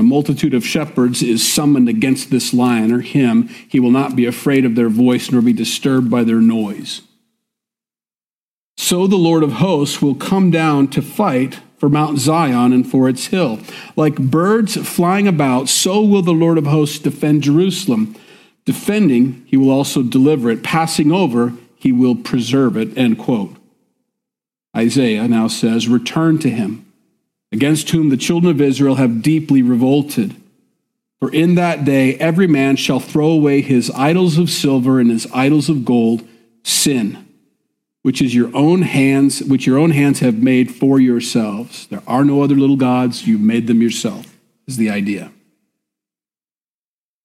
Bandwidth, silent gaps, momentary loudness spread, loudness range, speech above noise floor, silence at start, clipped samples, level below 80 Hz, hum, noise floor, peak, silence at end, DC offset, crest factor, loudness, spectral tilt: 15.5 kHz; 8.26-8.76 s; 7 LU; 4 LU; over 76 dB; 0 s; under 0.1%; -56 dBFS; none; under -90 dBFS; -2 dBFS; 1.95 s; under 0.1%; 12 dB; -14 LUFS; -5.5 dB/octave